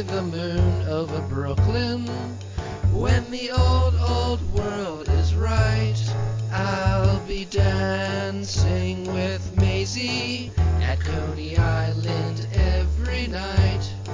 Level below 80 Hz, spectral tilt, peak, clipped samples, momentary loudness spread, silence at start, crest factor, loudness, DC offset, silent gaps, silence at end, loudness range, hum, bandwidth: -28 dBFS; -6 dB/octave; -6 dBFS; under 0.1%; 6 LU; 0 s; 16 dB; -24 LUFS; under 0.1%; none; 0 s; 1 LU; none; 7.6 kHz